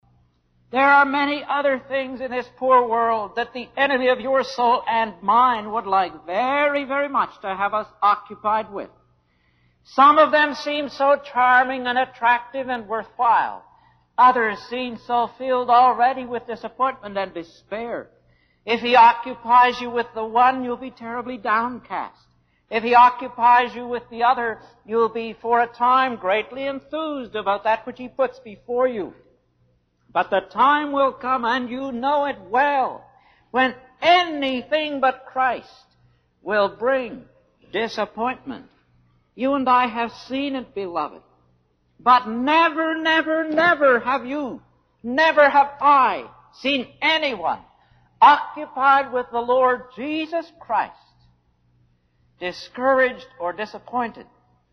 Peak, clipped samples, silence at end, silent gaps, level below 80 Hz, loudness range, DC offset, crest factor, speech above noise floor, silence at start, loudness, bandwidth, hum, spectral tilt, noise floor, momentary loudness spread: -4 dBFS; under 0.1%; 0.5 s; none; -62 dBFS; 7 LU; under 0.1%; 18 dB; 43 dB; 0.75 s; -20 LUFS; 6.6 kHz; 60 Hz at -65 dBFS; -4.5 dB/octave; -64 dBFS; 14 LU